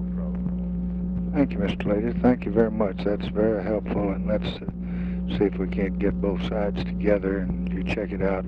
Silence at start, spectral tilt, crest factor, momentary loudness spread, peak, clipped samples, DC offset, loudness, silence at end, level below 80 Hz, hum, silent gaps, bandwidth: 0 s; -9.5 dB/octave; 18 dB; 6 LU; -8 dBFS; under 0.1%; under 0.1%; -26 LUFS; 0 s; -36 dBFS; none; none; 6 kHz